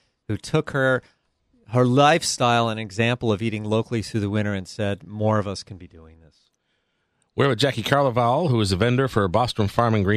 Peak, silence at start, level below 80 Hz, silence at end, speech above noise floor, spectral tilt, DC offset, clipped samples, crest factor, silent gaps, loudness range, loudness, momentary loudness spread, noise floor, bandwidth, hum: -4 dBFS; 0.3 s; -52 dBFS; 0 s; 50 dB; -5.5 dB/octave; under 0.1%; under 0.1%; 18 dB; none; 6 LU; -22 LUFS; 9 LU; -72 dBFS; 14 kHz; none